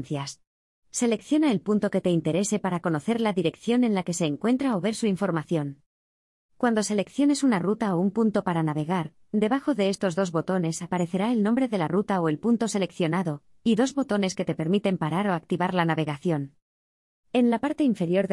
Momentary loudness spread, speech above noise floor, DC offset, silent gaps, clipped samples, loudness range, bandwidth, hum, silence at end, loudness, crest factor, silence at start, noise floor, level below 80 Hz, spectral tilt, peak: 5 LU; over 65 dB; under 0.1%; 0.47-0.82 s, 5.86-6.49 s, 16.62-17.23 s; under 0.1%; 2 LU; 12 kHz; none; 0 s; -25 LUFS; 18 dB; 0 s; under -90 dBFS; -66 dBFS; -6 dB/octave; -8 dBFS